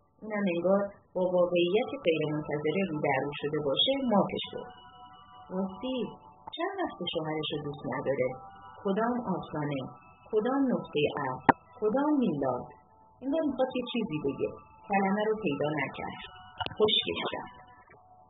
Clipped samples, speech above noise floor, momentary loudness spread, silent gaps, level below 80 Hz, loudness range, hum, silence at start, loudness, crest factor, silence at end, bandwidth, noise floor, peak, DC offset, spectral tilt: under 0.1%; 27 dB; 13 LU; none; -64 dBFS; 5 LU; none; 0.2 s; -30 LUFS; 28 dB; 0.5 s; 3.9 kHz; -57 dBFS; -4 dBFS; under 0.1%; -3.5 dB/octave